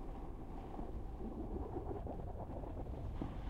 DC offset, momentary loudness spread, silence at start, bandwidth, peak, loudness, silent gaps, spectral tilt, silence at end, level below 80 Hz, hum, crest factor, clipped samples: under 0.1%; 5 LU; 0 s; 8.6 kHz; -26 dBFS; -47 LUFS; none; -9.5 dB/octave; 0 s; -48 dBFS; none; 18 dB; under 0.1%